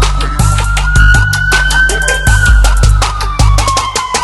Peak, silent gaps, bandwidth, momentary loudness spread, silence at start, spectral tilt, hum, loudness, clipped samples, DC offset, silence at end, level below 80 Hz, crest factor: 0 dBFS; none; 12 kHz; 5 LU; 0 s; -3.5 dB/octave; none; -10 LUFS; 0.6%; under 0.1%; 0 s; -12 dBFS; 8 dB